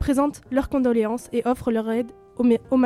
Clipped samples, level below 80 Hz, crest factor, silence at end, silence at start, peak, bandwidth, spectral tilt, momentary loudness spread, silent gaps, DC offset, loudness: under 0.1%; -44 dBFS; 14 dB; 0 s; 0 s; -6 dBFS; 13.5 kHz; -6.5 dB/octave; 5 LU; none; under 0.1%; -23 LUFS